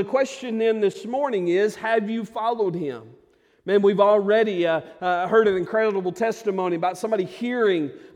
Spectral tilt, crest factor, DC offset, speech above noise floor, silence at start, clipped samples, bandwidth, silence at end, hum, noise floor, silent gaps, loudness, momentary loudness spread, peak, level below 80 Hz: -6 dB/octave; 16 dB; under 0.1%; 30 dB; 0 s; under 0.1%; 12 kHz; 0.1 s; none; -52 dBFS; none; -22 LUFS; 8 LU; -6 dBFS; -68 dBFS